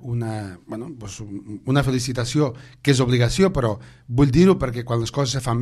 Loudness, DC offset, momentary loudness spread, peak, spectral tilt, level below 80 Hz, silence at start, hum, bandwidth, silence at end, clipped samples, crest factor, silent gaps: -20 LUFS; under 0.1%; 17 LU; -2 dBFS; -6 dB/octave; -40 dBFS; 0 s; none; 13 kHz; 0 s; under 0.1%; 18 dB; none